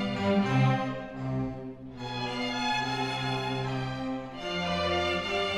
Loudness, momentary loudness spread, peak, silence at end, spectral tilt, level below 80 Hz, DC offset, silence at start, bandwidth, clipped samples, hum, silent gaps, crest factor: -30 LUFS; 10 LU; -14 dBFS; 0 s; -6 dB/octave; -54 dBFS; under 0.1%; 0 s; 12 kHz; under 0.1%; none; none; 16 dB